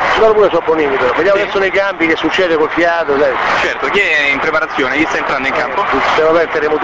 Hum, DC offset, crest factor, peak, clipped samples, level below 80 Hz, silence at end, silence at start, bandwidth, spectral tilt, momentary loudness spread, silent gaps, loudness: none; 0.4%; 12 dB; 0 dBFS; under 0.1%; -42 dBFS; 0 s; 0 s; 8 kHz; -4 dB/octave; 4 LU; none; -12 LUFS